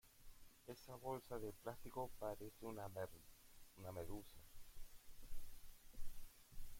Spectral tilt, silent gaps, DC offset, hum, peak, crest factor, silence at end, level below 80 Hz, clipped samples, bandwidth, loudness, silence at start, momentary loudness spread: -5.5 dB/octave; none; under 0.1%; none; -34 dBFS; 16 dB; 0 s; -60 dBFS; under 0.1%; 16.5 kHz; -54 LUFS; 0.05 s; 16 LU